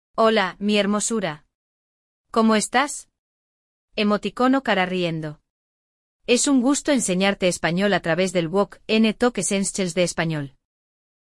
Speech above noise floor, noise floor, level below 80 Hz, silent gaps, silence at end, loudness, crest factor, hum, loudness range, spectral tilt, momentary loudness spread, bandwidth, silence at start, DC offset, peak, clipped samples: over 69 dB; under -90 dBFS; -56 dBFS; 1.55-2.25 s, 3.19-3.88 s, 5.50-6.20 s; 0.85 s; -21 LUFS; 18 dB; none; 4 LU; -4 dB/octave; 9 LU; 12 kHz; 0.15 s; under 0.1%; -4 dBFS; under 0.1%